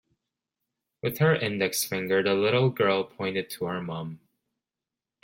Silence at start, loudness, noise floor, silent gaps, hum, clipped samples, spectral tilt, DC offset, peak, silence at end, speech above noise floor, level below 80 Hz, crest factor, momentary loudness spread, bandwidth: 1.05 s; -26 LUFS; -89 dBFS; none; none; under 0.1%; -5 dB/octave; under 0.1%; -8 dBFS; 1.05 s; 63 dB; -68 dBFS; 20 dB; 10 LU; 16.5 kHz